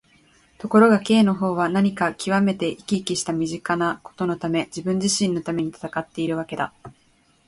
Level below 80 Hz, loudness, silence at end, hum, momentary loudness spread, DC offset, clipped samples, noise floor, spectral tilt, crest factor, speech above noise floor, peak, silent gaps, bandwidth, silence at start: -58 dBFS; -22 LUFS; 0.55 s; none; 11 LU; under 0.1%; under 0.1%; -60 dBFS; -5 dB/octave; 20 dB; 39 dB; -4 dBFS; none; 11.5 kHz; 0.6 s